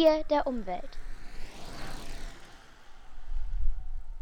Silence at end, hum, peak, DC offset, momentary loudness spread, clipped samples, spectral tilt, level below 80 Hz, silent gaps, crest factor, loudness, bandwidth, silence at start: 0 s; none; -12 dBFS; under 0.1%; 24 LU; under 0.1%; -5.5 dB/octave; -36 dBFS; none; 18 dB; -34 LUFS; 9.4 kHz; 0 s